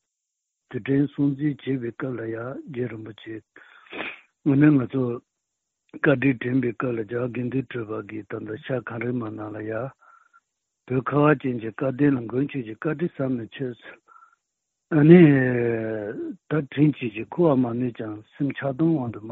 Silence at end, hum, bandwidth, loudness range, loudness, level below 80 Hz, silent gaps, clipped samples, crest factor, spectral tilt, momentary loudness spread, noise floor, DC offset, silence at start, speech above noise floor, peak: 0 s; none; 4.1 kHz; 10 LU; -24 LUFS; -62 dBFS; none; under 0.1%; 24 dB; -7.5 dB/octave; 15 LU; -82 dBFS; under 0.1%; 0.7 s; 59 dB; 0 dBFS